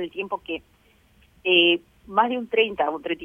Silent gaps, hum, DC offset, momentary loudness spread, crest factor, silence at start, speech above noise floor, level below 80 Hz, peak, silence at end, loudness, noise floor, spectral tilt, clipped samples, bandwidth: none; none; under 0.1%; 14 LU; 20 dB; 0 s; 35 dB; -60 dBFS; -4 dBFS; 0 s; -22 LUFS; -58 dBFS; -5.5 dB/octave; under 0.1%; 3.7 kHz